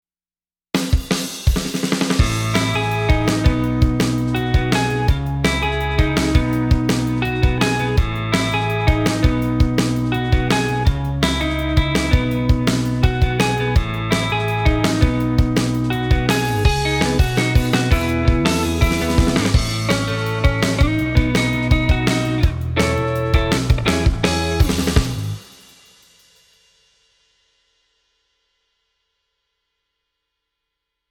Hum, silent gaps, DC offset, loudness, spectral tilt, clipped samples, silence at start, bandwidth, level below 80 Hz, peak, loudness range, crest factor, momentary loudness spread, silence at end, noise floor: none; none; under 0.1%; -18 LUFS; -5.5 dB/octave; under 0.1%; 0.75 s; 18.5 kHz; -24 dBFS; 0 dBFS; 2 LU; 18 dB; 3 LU; 5.7 s; under -90 dBFS